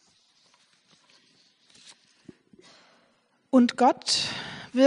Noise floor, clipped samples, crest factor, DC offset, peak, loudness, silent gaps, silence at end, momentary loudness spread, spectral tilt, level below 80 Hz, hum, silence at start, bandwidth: -67 dBFS; under 0.1%; 22 dB; under 0.1%; -6 dBFS; -24 LUFS; none; 0 s; 11 LU; -3 dB/octave; -74 dBFS; none; 3.55 s; 10.5 kHz